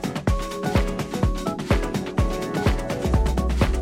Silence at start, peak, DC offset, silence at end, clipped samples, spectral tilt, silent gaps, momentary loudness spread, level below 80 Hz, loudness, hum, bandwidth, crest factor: 0 s; -6 dBFS; under 0.1%; 0 s; under 0.1%; -6.5 dB/octave; none; 3 LU; -26 dBFS; -24 LUFS; none; 16 kHz; 18 dB